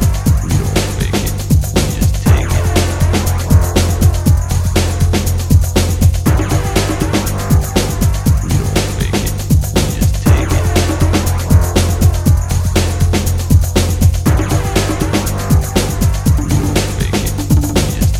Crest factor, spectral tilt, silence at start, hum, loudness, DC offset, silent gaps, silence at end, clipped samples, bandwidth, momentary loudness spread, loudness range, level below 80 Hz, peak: 12 dB; -5.5 dB/octave; 0 s; none; -14 LUFS; under 0.1%; none; 0 s; under 0.1%; 16.5 kHz; 4 LU; 1 LU; -18 dBFS; 0 dBFS